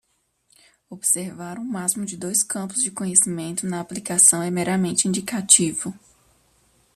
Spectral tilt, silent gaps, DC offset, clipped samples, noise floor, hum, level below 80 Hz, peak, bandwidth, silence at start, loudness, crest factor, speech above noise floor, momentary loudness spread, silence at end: -3 dB/octave; none; under 0.1%; under 0.1%; -68 dBFS; none; -62 dBFS; 0 dBFS; 14.5 kHz; 0.9 s; -20 LUFS; 24 dB; 45 dB; 15 LU; 1 s